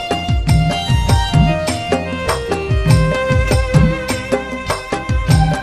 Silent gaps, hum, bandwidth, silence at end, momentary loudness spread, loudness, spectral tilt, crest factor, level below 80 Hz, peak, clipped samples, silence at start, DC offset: none; none; 15 kHz; 0 s; 7 LU; -16 LUFS; -6 dB/octave; 14 dB; -22 dBFS; 0 dBFS; under 0.1%; 0 s; under 0.1%